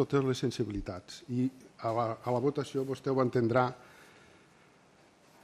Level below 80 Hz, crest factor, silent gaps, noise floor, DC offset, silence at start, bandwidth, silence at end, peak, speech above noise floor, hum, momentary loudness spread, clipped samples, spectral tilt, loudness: -58 dBFS; 20 dB; none; -62 dBFS; under 0.1%; 0 s; 14 kHz; 1.6 s; -14 dBFS; 31 dB; none; 10 LU; under 0.1%; -7 dB/octave; -32 LUFS